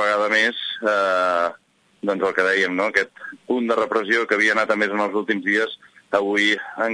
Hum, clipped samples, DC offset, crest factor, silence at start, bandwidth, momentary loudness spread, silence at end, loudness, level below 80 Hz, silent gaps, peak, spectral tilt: none; under 0.1%; under 0.1%; 16 dB; 0 s; 10.5 kHz; 8 LU; 0 s; -20 LUFS; -70 dBFS; none; -4 dBFS; -3.5 dB/octave